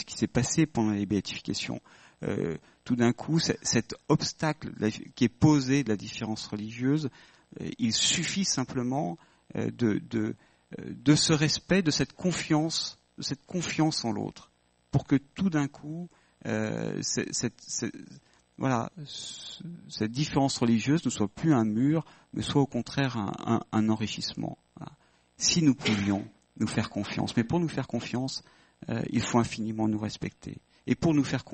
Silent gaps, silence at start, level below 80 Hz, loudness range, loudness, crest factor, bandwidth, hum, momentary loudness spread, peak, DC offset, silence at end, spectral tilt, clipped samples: none; 0 s; -58 dBFS; 4 LU; -29 LUFS; 22 dB; 8.8 kHz; none; 14 LU; -8 dBFS; under 0.1%; 0 s; -4.5 dB/octave; under 0.1%